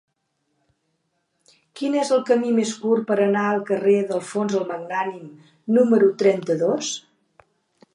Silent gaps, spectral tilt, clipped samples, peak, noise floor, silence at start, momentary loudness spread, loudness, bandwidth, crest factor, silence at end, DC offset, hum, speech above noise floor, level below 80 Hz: none; -5 dB/octave; under 0.1%; -6 dBFS; -73 dBFS; 1.75 s; 11 LU; -21 LUFS; 11 kHz; 18 dB; 0.95 s; under 0.1%; none; 53 dB; -76 dBFS